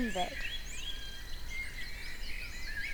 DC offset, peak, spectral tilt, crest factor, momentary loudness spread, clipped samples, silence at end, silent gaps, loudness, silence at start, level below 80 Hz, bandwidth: under 0.1%; -22 dBFS; -3 dB/octave; 16 dB; 7 LU; under 0.1%; 0 s; none; -40 LUFS; 0 s; -44 dBFS; over 20 kHz